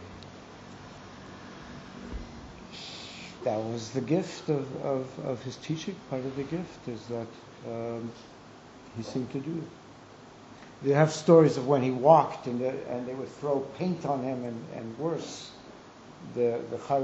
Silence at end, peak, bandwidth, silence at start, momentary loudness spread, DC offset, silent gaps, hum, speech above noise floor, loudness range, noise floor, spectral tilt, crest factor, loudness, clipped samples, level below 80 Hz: 0 s; -6 dBFS; 8 kHz; 0 s; 24 LU; under 0.1%; none; none; 22 dB; 14 LU; -50 dBFS; -6.5 dB/octave; 24 dB; -29 LUFS; under 0.1%; -58 dBFS